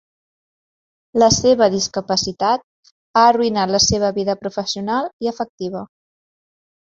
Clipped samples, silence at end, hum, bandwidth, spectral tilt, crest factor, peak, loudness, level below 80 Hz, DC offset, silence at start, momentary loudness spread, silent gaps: under 0.1%; 1 s; none; 8 kHz; -3.5 dB/octave; 18 dB; -2 dBFS; -18 LUFS; -46 dBFS; under 0.1%; 1.15 s; 11 LU; 2.64-2.83 s, 2.91-3.14 s, 5.13-5.19 s, 5.49-5.58 s